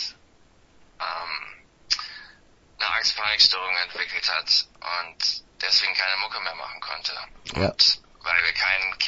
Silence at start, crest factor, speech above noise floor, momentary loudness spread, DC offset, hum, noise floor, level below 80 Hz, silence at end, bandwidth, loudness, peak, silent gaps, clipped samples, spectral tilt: 0 s; 24 dB; 32 dB; 15 LU; under 0.1%; none; -57 dBFS; -54 dBFS; 0 s; 8 kHz; -23 LUFS; -2 dBFS; none; under 0.1%; -1.5 dB/octave